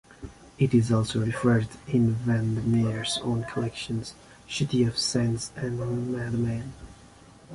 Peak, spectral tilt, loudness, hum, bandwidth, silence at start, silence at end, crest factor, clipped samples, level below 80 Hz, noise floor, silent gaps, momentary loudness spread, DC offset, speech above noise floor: -10 dBFS; -6 dB/octave; -27 LUFS; none; 11.5 kHz; 0.1 s; 0 s; 16 dB; under 0.1%; -50 dBFS; -51 dBFS; none; 11 LU; under 0.1%; 25 dB